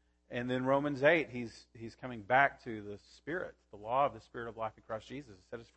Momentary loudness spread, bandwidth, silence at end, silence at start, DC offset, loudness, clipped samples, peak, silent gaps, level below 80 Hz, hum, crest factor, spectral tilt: 20 LU; 8.4 kHz; 0.15 s; 0.3 s; under 0.1%; -34 LUFS; under 0.1%; -14 dBFS; none; -66 dBFS; none; 22 dB; -6.5 dB/octave